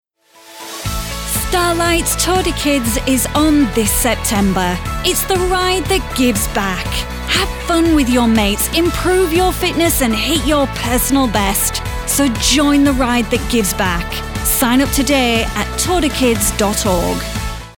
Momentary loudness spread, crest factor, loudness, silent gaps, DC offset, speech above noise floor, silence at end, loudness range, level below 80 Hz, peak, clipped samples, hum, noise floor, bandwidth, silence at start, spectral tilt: 7 LU; 14 dB; -15 LUFS; none; under 0.1%; 29 dB; 0.05 s; 2 LU; -26 dBFS; 0 dBFS; under 0.1%; none; -44 dBFS; 19.5 kHz; 0.45 s; -3.5 dB/octave